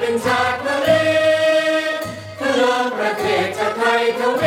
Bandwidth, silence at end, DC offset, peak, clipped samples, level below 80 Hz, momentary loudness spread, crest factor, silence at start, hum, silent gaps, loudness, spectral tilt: 16.5 kHz; 0 s; under 0.1%; -4 dBFS; under 0.1%; -56 dBFS; 6 LU; 14 dB; 0 s; none; none; -17 LUFS; -4 dB/octave